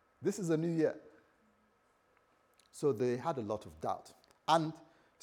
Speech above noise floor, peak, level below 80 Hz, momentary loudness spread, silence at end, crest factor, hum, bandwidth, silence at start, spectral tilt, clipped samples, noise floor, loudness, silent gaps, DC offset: 38 dB; -14 dBFS; -76 dBFS; 12 LU; 0.4 s; 24 dB; none; 16.5 kHz; 0.2 s; -6 dB/octave; under 0.1%; -72 dBFS; -36 LUFS; none; under 0.1%